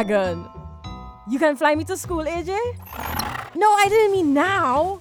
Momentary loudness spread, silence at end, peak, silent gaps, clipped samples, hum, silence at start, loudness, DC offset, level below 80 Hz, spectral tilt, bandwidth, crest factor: 21 LU; 0 s; -4 dBFS; none; under 0.1%; none; 0 s; -20 LUFS; under 0.1%; -44 dBFS; -4.5 dB/octave; over 20 kHz; 16 dB